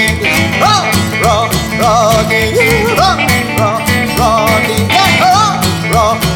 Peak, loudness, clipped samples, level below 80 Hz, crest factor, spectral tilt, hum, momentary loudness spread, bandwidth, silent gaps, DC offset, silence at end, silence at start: 0 dBFS; -10 LUFS; under 0.1%; -28 dBFS; 10 dB; -4 dB/octave; none; 4 LU; over 20 kHz; none; under 0.1%; 0 s; 0 s